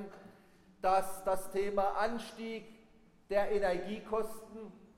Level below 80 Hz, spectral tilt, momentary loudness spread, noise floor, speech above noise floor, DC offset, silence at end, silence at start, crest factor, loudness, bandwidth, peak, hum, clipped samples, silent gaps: -56 dBFS; -4.5 dB/octave; 17 LU; -62 dBFS; 28 dB; under 0.1%; 0.2 s; 0 s; 18 dB; -35 LUFS; 16.5 kHz; -18 dBFS; none; under 0.1%; none